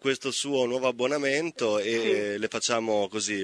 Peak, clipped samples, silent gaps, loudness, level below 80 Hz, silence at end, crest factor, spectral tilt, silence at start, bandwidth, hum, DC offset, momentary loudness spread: -10 dBFS; under 0.1%; none; -27 LUFS; -72 dBFS; 0 s; 18 dB; -3 dB/octave; 0 s; 11 kHz; none; under 0.1%; 3 LU